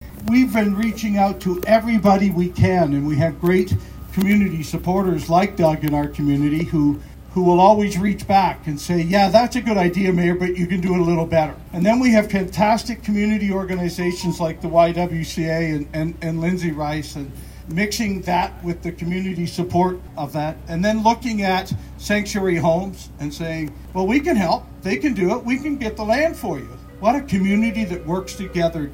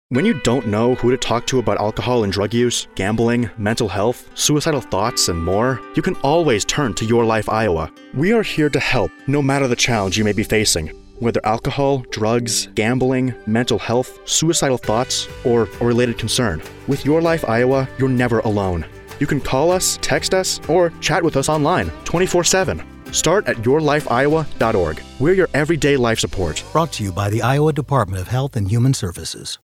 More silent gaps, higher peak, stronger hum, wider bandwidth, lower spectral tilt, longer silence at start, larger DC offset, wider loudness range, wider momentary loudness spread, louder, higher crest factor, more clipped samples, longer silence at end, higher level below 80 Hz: neither; about the same, 0 dBFS vs -2 dBFS; neither; about the same, 16.5 kHz vs 16.5 kHz; first, -6.5 dB/octave vs -4.5 dB/octave; about the same, 0 s vs 0.1 s; neither; first, 5 LU vs 1 LU; first, 10 LU vs 6 LU; about the same, -20 LUFS vs -18 LUFS; about the same, 18 dB vs 16 dB; neither; about the same, 0 s vs 0.1 s; about the same, -38 dBFS vs -38 dBFS